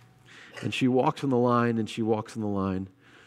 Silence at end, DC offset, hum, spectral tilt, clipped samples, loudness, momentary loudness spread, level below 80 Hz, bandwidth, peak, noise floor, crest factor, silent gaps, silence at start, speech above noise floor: 0.4 s; under 0.1%; none; -7 dB/octave; under 0.1%; -27 LUFS; 12 LU; -72 dBFS; 12 kHz; -10 dBFS; -52 dBFS; 18 dB; none; 0.3 s; 26 dB